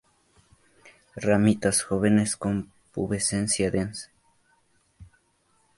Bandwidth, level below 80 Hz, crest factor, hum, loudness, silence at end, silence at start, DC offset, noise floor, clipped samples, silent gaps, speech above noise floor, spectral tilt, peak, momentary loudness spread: 11.5 kHz; -52 dBFS; 20 dB; none; -25 LUFS; 0.75 s; 0.85 s; under 0.1%; -67 dBFS; under 0.1%; none; 43 dB; -4.5 dB/octave; -8 dBFS; 15 LU